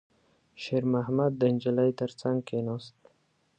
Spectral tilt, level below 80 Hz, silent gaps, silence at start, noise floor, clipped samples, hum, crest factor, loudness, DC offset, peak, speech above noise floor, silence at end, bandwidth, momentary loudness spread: -8 dB/octave; -70 dBFS; none; 0.6 s; -70 dBFS; under 0.1%; none; 16 dB; -29 LUFS; under 0.1%; -14 dBFS; 42 dB; 0.7 s; 9 kHz; 9 LU